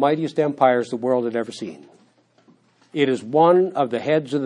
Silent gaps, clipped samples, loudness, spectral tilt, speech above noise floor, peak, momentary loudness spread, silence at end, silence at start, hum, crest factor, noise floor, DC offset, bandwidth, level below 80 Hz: none; under 0.1%; -20 LUFS; -6.5 dB/octave; 38 dB; -2 dBFS; 15 LU; 0 s; 0 s; none; 20 dB; -58 dBFS; under 0.1%; 10.5 kHz; -76 dBFS